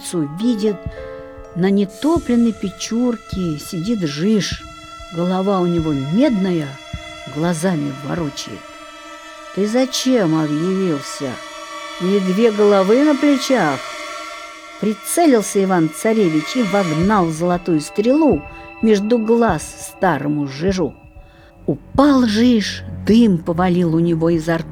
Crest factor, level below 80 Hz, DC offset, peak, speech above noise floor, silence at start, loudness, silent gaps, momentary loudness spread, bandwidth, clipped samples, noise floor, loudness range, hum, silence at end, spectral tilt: 18 dB; -42 dBFS; under 0.1%; 0 dBFS; 26 dB; 0 s; -17 LUFS; none; 16 LU; 17.5 kHz; under 0.1%; -42 dBFS; 4 LU; none; 0 s; -6 dB/octave